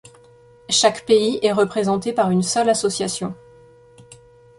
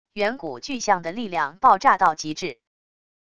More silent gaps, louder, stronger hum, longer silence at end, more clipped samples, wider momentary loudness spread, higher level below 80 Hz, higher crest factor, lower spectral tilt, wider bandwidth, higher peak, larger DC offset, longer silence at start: neither; first, -19 LUFS vs -22 LUFS; neither; second, 0.45 s vs 0.8 s; neither; second, 9 LU vs 14 LU; about the same, -58 dBFS vs -60 dBFS; about the same, 18 dB vs 20 dB; about the same, -4 dB/octave vs -3.5 dB/octave; about the same, 11.5 kHz vs 10.5 kHz; about the same, -4 dBFS vs -4 dBFS; second, under 0.1% vs 0.5%; first, 0.7 s vs 0.15 s